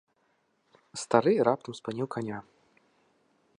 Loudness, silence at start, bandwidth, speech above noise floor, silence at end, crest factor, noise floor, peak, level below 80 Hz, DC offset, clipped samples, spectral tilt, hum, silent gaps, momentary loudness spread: -29 LUFS; 0.95 s; 11.5 kHz; 44 dB; 1.2 s; 24 dB; -72 dBFS; -6 dBFS; -74 dBFS; under 0.1%; under 0.1%; -5.5 dB/octave; none; none; 17 LU